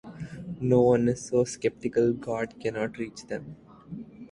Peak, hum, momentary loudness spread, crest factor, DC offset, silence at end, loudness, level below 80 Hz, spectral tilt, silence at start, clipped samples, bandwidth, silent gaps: -8 dBFS; none; 20 LU; 18 dB; under 0.1%; 0.05 s; -27 LUFS; -58 dBFS; -6.5 dB/octave; 0.05 s; under 0.1%; 11 kHz; none